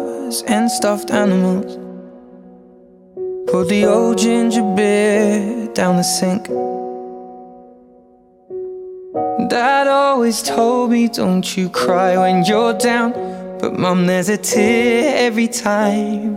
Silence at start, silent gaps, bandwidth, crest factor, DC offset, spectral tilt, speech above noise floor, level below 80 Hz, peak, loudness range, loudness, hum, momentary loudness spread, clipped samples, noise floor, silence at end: 0 s; none; 16.5 kHz; 16 dB; under 0.1%; -5 dB/octave; 34 dB; -56 dBFS; -2 dBFS; 6 LU; -16 LUFS; none; 15 LU; under 0.1%; -49 dBFS; 0 s